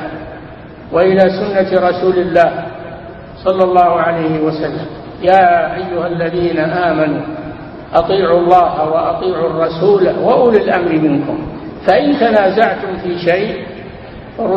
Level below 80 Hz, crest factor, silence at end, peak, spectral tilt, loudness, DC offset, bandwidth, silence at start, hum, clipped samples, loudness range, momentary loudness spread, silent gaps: -42 dBFS; 14 dB; 0 s; 0 dBFS; -8.5 dB/octave; -13 LUFS; under 0.1%; 6.2 kHz; 0 s; none; under 0.1%; 2 LU; 18 LU; none